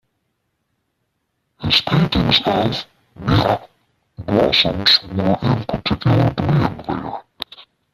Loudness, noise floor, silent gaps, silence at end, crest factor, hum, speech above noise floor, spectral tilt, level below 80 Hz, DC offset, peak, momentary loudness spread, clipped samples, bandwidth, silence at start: -17 LUFS; -71 dBFS; none; 0.3 s; 18 dB; none; 54 dB; -6.5 dB/octave; -40 dBFS; under 0.1%; 0 dBFS; 16 LU; under 0.1%; 14 kHz; 1.6 s